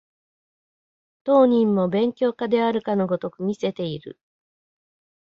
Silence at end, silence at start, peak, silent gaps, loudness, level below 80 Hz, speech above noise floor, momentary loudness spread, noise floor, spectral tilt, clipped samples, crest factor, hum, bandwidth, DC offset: 1.1 s; 1.25 s; -6 dBFS; none; -22 LUFS; -66 dBFS; over 69 dB; 13 LU; under -90 dBFS; -8 dB/octave; under 0.1%; 16 dB; none; 7.4 kHz; under 0.1%